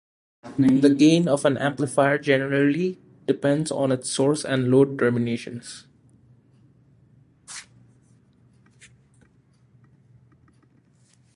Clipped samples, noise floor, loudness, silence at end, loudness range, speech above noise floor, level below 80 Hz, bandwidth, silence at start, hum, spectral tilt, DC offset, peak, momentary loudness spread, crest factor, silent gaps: under 0.1%; -59 dBFS; -21 LUFS; 3.75 s; 10 LU; 38 dB; -64 dBFS; 11.5 kHz; 0.45 s; none; -6 dB/octave; under 0.1%; -4 dBFS; 20 LU; 20 dB; none